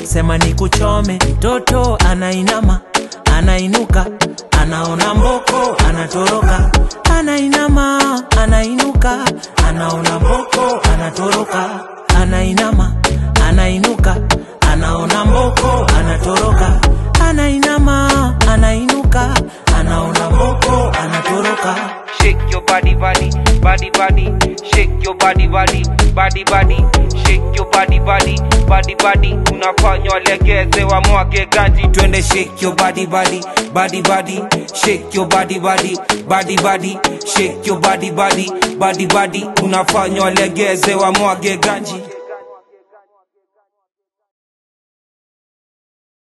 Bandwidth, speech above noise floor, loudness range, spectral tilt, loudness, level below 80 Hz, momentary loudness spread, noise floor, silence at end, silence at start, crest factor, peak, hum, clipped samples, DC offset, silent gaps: 12.5 kHz; 52 dB; 2 LU; -4.5 dB/octave; -13 LUFS; -16 dBFS; 4 LU; -64 dBFS; 3.8 s; 0 s; 12 dB; 0 dBFS; none; under 0.1%; under 0.1%; none